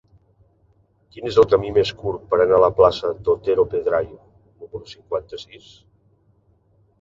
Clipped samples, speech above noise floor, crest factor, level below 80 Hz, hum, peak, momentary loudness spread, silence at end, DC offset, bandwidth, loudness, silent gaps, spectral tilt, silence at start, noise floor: under 0.1%; 41 dB; 20 dB; -48 dBFS; none; -2 dBFS; 21 LU; 1.45 s; under 0.1%; 7.6 kHz; -19 LUFS; none; -6.5 dB/octave; 1.15 s; -60 dBFS